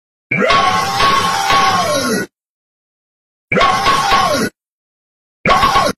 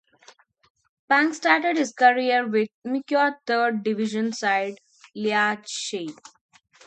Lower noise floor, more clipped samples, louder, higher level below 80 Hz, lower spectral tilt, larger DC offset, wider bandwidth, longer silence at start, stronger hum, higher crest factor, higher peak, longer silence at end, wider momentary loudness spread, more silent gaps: first, under -90 dBFS vs -55 dBFS; neither; first, -13 LUFS vs -23 LUFS; first, -36 dBFS vs -78 dBFS; about the same, -3 dB/octave vs -3.5 dB/octave; neither; first, 15 kHz vs 9.2 kHz; second, 0.3 s vs 1.1 s; neither; second, 14 dB vs 22 dB; about the same, 0 dBFS vs -2 dBFS; second, 0.05 s vs 0.75 s; second, 8 LU vs 11 LU; first, 2.49-3.48 s, 4.68-5.44 s vs 2.74-2.82 s